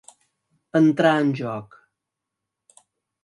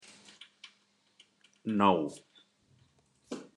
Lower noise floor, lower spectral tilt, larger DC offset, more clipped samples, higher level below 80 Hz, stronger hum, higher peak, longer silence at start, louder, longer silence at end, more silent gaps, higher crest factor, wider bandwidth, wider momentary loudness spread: first, -84 dBFS vs -70 dBFS; about the same, -7 dB/octave vs -6 dB/octave; neither; neither; first, -72 dBFS vs -80 dBFS; neither; first, -4 dBFS vs -10 dBFS; about the same, 0.75 s vs 0.65 s; first, -20 LUFS vs -30 LUFS; first, 1.6 s vs 0.15 s; neither; about the same, 20 dB vs 24 dB; about the same, 11 kHz vs 11 kHz; second, 14 LU vs 27 LU